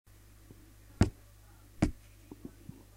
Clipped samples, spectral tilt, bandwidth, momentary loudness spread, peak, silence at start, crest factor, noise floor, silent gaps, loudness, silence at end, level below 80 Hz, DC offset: under 0.1%; -7 dB/octave; 16 kHz; 26 LU; -12 dBFS; 1 s; 26 dB; -57 dBFS; none; -34 LUFS; 0.6 s; -44 dBFS; under 0.1%